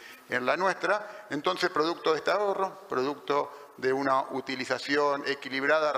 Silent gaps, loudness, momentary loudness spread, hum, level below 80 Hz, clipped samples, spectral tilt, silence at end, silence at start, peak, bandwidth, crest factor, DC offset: none; -29 LUFS; 6 LU; none; -76 dBFS; under 0.1%; -4 dB/octave; 0 s; 0 s; -12 dBFS; 15.5 kHz; 18 dB; under 0.1%